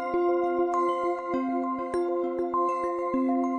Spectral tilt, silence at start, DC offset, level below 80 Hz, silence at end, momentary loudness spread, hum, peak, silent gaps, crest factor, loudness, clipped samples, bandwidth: -6.5 dB/octave; 0 s; under 0.1%; -62 dBFS; 0 s; 3 LU; none; -14 dBFS; none; 12 dB; -27 LUFS; under 0.1%; 9.4 kHz